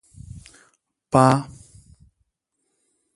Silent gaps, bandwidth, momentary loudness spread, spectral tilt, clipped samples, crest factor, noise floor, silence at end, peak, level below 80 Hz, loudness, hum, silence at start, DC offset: none; 11.5 kHz; 26 LU; -6.5 dB/octave; under 0.1%; 24 dB; -76 dBFS; 1.7 s; 0 dBFS; -52 dBFS; -19 LUFS; none; 1.15 s; under 0.1%